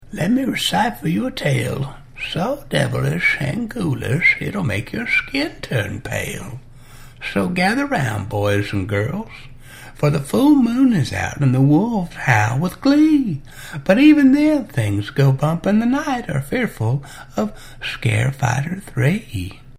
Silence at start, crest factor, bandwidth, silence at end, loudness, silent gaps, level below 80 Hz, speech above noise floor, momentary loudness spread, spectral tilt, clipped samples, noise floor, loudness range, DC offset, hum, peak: 0 s; 18 dB; 16 kHz; 0 s; -18 LUFS; none; -42 dBFS; 21 dB; 12 LU; -6 dB/octave; under 0.1%; -39 dBFS; 6 LU; under 0.1%; none; 0 dBFS